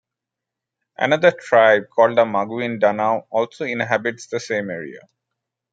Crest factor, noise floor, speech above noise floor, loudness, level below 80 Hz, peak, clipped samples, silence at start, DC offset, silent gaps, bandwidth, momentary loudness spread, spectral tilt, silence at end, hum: 18 dB; -85 dBFS; 66 dB; -19 LUFS; -70 dBFS; -2 dBFS; under 0.1%; 1 s; under 0.1%; none; 7.8 kHz; 10 LU; -5 dB/octave; 0.75 s; none